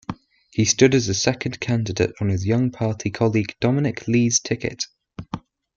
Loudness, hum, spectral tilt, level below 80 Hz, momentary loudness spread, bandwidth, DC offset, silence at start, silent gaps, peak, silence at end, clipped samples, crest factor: -21 LUFS; none; -4.5 dB/octave; -52 dBFS; 18 LU; 7.8 kHz; under 0.1%; 0.1 s; none; -2 dBFS; 0.35 s; under 0.1%; 20 dB